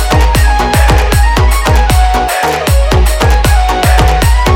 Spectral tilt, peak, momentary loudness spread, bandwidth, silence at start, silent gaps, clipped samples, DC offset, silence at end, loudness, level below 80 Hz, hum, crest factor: -4.5 dB/octave; 0 dBFS; 2 LU; 17 kHz; 0 s; none; under 0.1%; under 0.1%; 0 s; -9 LUFS; -10 dBFS; none; 8 dB